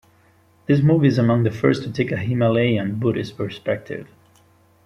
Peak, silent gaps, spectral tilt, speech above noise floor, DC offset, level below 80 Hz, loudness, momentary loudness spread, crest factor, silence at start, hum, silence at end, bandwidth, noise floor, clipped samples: -2 dBFS; none; -8.5 dB/octave; 37 dB; under 0.1%; -56 dBFS; -20 LUFS; 11 LU; 18 dB; 0.7 s; none; 0.8 s; 10.5 kHz; -56 dBFS; under 0.1%